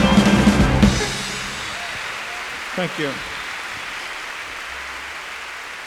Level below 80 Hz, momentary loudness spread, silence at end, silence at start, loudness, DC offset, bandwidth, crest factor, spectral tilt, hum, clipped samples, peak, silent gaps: -32 dBFS; 15 LU; 0 s; 0 s; -22 LUFS; under 0.1%; 15.5 kHz; 20 dB; -5 dB/octave; none; under 0.1%; -2 dBFS; none